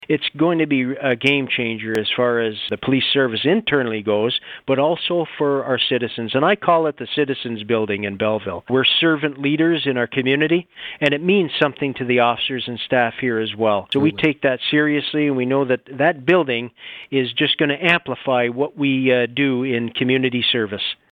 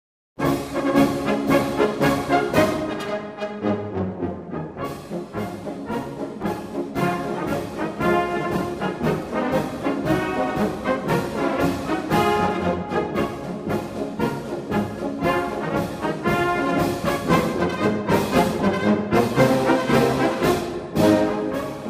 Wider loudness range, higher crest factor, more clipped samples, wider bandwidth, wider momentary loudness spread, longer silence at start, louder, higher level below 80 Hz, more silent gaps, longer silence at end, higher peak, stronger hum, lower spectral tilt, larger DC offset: second, 1 LU vs 8 LU; about the same, 18 dB vs 20 dB; neither; second, 8.8 kHz vs 15.5 kHz; second, 5 LU vs 10 LU; second, 0 s vs 0.4 s; first, -19 LUFS vs -23 LUFS; second, -60 dBFS vs -46 dBFS; neither; first, 0.2 s vs 0 s; about the same, -2 dBFS vs -2 dBFS; neither; about the same, -7 dB/octave vs -6 dB/octave; neither